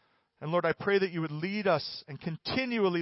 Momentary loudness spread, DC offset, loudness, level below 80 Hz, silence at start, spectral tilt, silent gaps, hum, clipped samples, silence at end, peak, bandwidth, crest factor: 11 LU; under 0.1%; -31 LUFS; -66 dBFS; 0.4 s; -9 dB/octave; none; none; under 0.1%; 0 s; -14 dBFS; 5.8 kHz; 16 dB